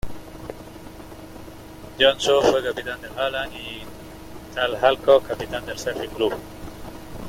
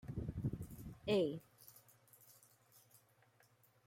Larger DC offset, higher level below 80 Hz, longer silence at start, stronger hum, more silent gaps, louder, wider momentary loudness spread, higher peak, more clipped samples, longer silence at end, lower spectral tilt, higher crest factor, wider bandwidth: neither; first, -46 dBFS vs -62 dBFS; about the same, 0.05 s vs 0.05 s; neither; neither; first, -22 LUFS vs -42 LUFS; second, 23 LU vs 26 LU; first, -4 dBFS vs -26 dBFS; neither; second, 0 s vs 0.9 s; second, -3.5 dB/octave vs -6.5 dB/octave; about the same, 20 dB vs 20 dB; about the same, 16.5 kHz vs 16.5 kHz